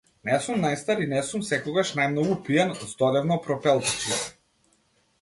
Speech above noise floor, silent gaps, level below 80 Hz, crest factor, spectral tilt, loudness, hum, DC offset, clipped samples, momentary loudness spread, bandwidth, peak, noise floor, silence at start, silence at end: 42 dB; none; -62 dBFS; 18 dB; -4.5 dB/octave; -25 LUFS; none; under 0.1%; under 0.1%; 5 LU; 12 kHz; -8 dBFS; -66 dBFS; 0.25 s; 0.9 s